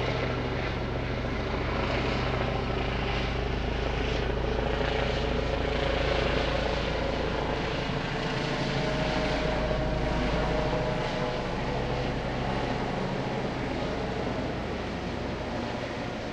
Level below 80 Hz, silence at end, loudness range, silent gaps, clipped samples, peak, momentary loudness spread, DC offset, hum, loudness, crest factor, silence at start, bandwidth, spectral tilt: -36 dBFS; 0 s; 3 LU; none; under 0.1%; -12 dBFS; 4 LU; under 0.1%; none; -30 LUFS; 16 dB; 0 s; 9.4 kHz; -6 dB/octave